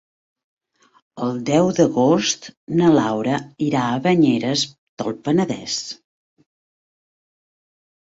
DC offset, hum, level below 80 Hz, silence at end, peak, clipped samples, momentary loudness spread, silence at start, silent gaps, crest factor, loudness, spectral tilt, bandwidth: under 0.1%; none; -60 dBFS; 2.15 s; -2 dBFS; under 0.1%; 11 LU; 1.15 s; 2.57-2.67 s, 4.78-4.97 s; 18 dB; -19 LUFS; -5 dB/octave; 8 kHz